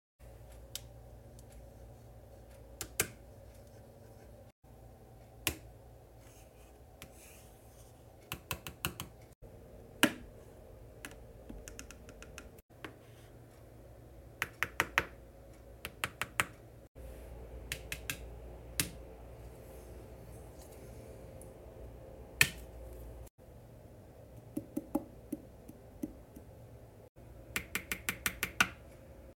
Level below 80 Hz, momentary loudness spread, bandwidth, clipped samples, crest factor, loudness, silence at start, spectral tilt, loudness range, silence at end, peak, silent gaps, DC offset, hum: -56 dBFS; 23 LU; 17 kHz; under 0.1%; 36 dB; -39 LUFS; 0.2 s; -2.5 dB/octave; 9 LU; 0 s; -6 dBFS; 4.52-4.62 s, 9.35-9.41 s, 12.62-12.69 s, 16.88-16.95 s, 23.30-23.38 s, 27.09-27.15 s; under 0.1%; none